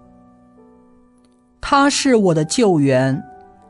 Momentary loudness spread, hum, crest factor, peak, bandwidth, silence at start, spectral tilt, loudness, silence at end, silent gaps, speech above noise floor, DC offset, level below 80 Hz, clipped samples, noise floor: 8 LU; none; 16 dB; -2 dBFS; 11.5 kHz; 1.65 s; -5 dB/octave; -16 LUFS; 0.35 s; none; 39 dB; under 0.1%; -48 dBFS; under 0.1%; -54 dBFS